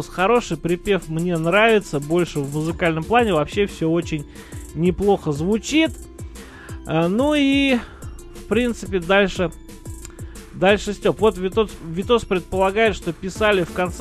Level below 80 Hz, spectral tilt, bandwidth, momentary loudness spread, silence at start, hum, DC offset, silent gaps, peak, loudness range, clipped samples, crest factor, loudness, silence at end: -38 dBFS; -5.5 dB/octave; 13 kHz; 19 LU; 0 s; none; under 0.1%; none; -2 dBFS; 3 LU; under 0.1%; 18 dB; -20 LUFS; 0 s